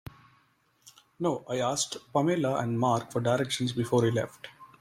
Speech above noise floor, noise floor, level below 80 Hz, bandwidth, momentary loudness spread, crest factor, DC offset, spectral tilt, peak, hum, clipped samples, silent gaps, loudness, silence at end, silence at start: 39 dB; -68 dBFS; -64 dBFS; 16 kHz; 9 LU; 18 dB; under 0.1%; -5 dB/octave; -12 dBFS; none; under 0.1%; none; -29 LUFS; 0.15 s; 0.85 s